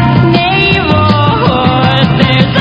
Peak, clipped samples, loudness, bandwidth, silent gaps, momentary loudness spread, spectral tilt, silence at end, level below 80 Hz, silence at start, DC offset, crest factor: 0 dBFS; 1%; -8 LUFS; 8 kHz; none; 1 LU; -8 dB/octave; 0 s; -26 dBFS; 0 s; under 0.1%; 8 dB